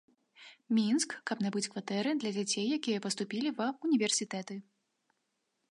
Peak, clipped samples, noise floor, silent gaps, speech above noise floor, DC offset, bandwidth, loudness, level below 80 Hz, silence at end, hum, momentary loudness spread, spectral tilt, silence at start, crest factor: -18 dBFS; under 0.1%; -82 dBFS; none; 49 dB; under 0.1%; 11.5 kHz; -33 LUFS; -86 dBFS; 1.1 s; none; 7 LU; -3.5 dB/octave; 0.4 s; 18 dB